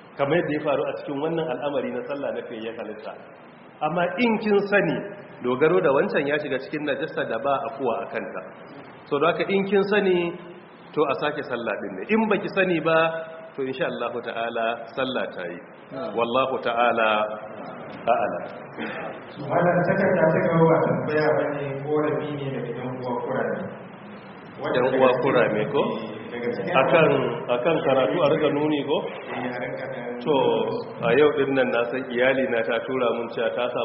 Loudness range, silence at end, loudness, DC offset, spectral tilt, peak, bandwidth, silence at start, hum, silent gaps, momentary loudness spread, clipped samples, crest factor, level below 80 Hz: 5 LU; 0 s; -24 LUFS; under 0.1%; -4.5 dB/octave; -4 dBFS; 5.8 kHz; 0 s; none; none; 14 LU; under 0.1%; 20 dB; -64 dBFS